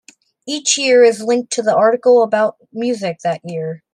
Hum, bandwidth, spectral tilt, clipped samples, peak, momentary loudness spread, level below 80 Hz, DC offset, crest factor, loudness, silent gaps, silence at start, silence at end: none; 11 kHz; -3 dB/octave; under 0.1%; -2 dBFS; 13 LU; -70 dBFS; under 0.1%; 14 dB; -15 LUFS; none; 0.45 s; 0.15 s